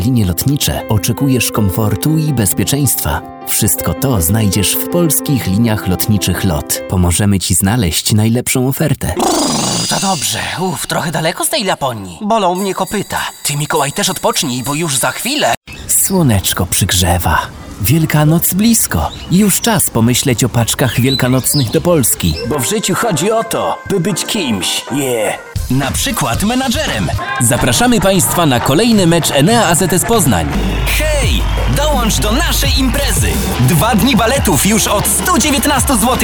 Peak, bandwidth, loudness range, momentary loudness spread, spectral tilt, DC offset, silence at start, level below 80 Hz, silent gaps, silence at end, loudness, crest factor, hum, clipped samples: 0 dBFS; over 20 kHz; 4 LU; 6 LU; -4 dB/octave; under 0.1%; 0 s; -26 dBFS; 15.57-15.61 s; 0 s; -13 LUFS; 12 dB; none; under 0.1%